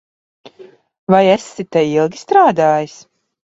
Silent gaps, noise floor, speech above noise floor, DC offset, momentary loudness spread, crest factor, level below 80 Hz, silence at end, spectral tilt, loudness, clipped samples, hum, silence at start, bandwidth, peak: 0.98-1.07 s; -43 dBFS; 30 dB; under 0.1%; 8 LU; 16 dB; -58 dBFS; 0.55 s; -6 dB/octave; -14 LUFS; under 0.1%; none; 0.45 s; 8 kHz; 0 dBFS